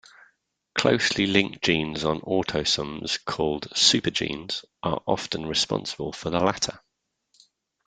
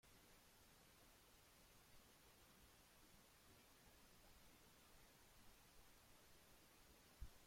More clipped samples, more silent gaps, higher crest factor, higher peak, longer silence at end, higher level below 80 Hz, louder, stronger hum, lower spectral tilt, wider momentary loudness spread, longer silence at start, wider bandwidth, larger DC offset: neither; neither; about the same, 26 dB vs 26 dB; first, -2 dBFS vs -42 dBFS; first, 1.1 s vs 0 s; first, -54 dBFS vs -74 dBFS; first, -24 LUFS vs -69 LUFS; neither; about the same, -3 dB/octave vs -3 dB/octave; first, 10 LU vs 0 LU; first, 0.75 s vs 0.05 s; second, 9.6 kHz vs 16.5 kHz; neither